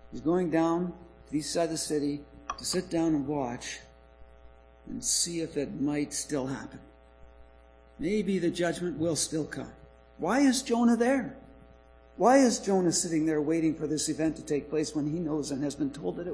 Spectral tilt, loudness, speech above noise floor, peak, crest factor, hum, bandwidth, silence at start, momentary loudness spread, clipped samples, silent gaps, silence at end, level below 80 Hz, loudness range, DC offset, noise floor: -4.5 dB/octave; -29 LUFS; 27 dB; -10 dBFS; 20 dB; none; 11 kHz; 0 s; 12 LU; under 0.1%; none; 0 s; -56 dBFS; 6 LU; under 0.1%; -56 dBFS